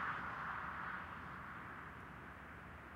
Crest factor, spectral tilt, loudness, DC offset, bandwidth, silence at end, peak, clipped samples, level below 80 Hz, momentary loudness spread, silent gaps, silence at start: 18 dB; -6 dB/octave; -48 LUFS; under 0.1%; 16 kHz; 0 s; -30 dBFS; under 0.1%; -66 dBFS; 9 LU; none; 0 s